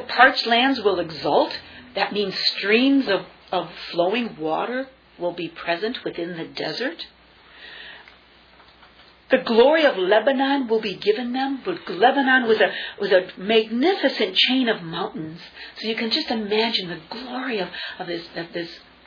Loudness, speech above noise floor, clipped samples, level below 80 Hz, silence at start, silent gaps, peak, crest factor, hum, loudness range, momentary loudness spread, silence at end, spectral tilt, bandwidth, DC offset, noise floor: -21 LUFS; 30 dB; under 0.1%; -62 dBFS; 0 s; none; -2 dBFS; 20 dB; none; 10 LU; 15 LU; 0.3 s; -5.5 dB/octave; 5.4 kHz; under 0.1%; -51 dBFS